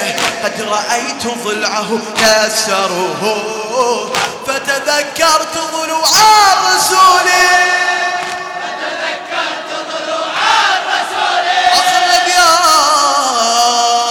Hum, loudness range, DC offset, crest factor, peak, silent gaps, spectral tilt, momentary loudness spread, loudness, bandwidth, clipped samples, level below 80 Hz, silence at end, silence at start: none; 5 LU; under 0.1%; 12 dB; 0 dBFS; none; -0.5 dB/octave; 11 LU; -12 LUFS; 19.5 kHz; under 0.1%; -52 dBFS; 0 s; 0 s